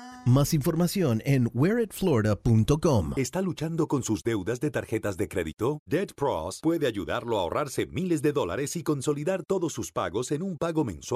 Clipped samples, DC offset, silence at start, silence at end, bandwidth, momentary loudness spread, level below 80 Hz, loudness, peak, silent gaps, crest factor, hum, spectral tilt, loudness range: under 0.1%; under 0.1%; 0 s; 0 s; 15.5 kHz; 6 LU; -48 dBFS; -27 LUFS; -10 dBFS; 5.79-5.86 s; 16 dB; none; -6 dB/octave; 4 LU